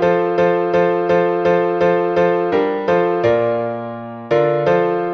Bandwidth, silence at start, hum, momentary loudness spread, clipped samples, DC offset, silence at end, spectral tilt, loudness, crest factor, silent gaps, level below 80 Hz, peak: 6.2 kHz; 0 s; none; 5 LU; under 0.1%; under 0.1%; 0 s; -8 dB/octave; -16 LUFS; 14 dB; none; -54 dBFS; -2 dBFS